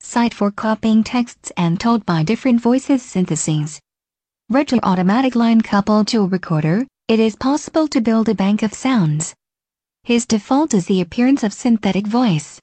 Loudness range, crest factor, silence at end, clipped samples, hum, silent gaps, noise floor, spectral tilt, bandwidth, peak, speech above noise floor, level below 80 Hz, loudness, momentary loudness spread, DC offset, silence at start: 2 LU; 14 dB; 0.1 s; under 0.1%; none; none; -89 dBFS; -6 dB/octave; 9 kHz; -2 dBFS; 73 dB; -52 dBFS; -17 LUFS; 5 LU; under 0.1%; 0.05 s